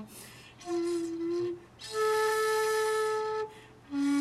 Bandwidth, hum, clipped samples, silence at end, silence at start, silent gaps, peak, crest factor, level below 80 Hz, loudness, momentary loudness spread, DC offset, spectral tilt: 14.5 kHz; none; under 0.1%; 0 s; 0 s; none; -18 dBFS; 14 dB; -68 dBFS; -31 LUFS; 16 LU; under 0.1%; -3.5 dB/octave